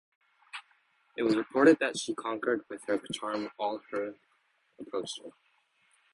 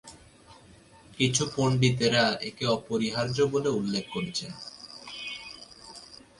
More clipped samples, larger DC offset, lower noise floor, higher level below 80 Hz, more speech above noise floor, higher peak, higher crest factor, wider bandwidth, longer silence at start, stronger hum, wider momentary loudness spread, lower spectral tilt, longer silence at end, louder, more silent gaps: neither; neither; first, -72 dBFS vs -54 dBFS; second, -76 dBFS vs -60 dBFS; first, 42 dB vs 27 dB; about the same, -8 dBFS vs -10 dBFS; about the same, 24 dB vs 20 dB; about the same, 11.5 kHz vs 11.5 kHz; first, 0.55 s vs 0.05 s; neither; about the same, 22 LU vs 20 LU; about the same, -4 dB/octave vs -4.5 dB/octave; first, 0.85 s vs 0.25 s; second, -31 LUFS vs -27 LUFS; neither